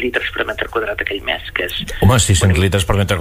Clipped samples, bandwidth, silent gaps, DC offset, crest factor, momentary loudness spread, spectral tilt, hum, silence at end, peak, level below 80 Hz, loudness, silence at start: under 0.1%; 16 kHz; none; under 0.1%; 14 dB; 8 LU; -4.5 dB/octave; none; 0 s; -2 dBFS; -28 dBFS; -16 LUFS; 0 s